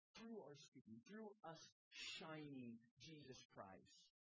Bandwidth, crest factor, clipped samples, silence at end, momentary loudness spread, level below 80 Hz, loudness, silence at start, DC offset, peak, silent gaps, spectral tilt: 8 kHz; 18 dB; under 0.1%; 0.25 s; 10 LU; under -90 dBFS; -59 LUFS; 0.15 s; under 0.1%; -42 dBFS; 0.68-0.72 s, 0.81-0.85 s, 1.72-1.91 s, 2.91-2.97 s, 3.45-3.50 s; -4 dB/octave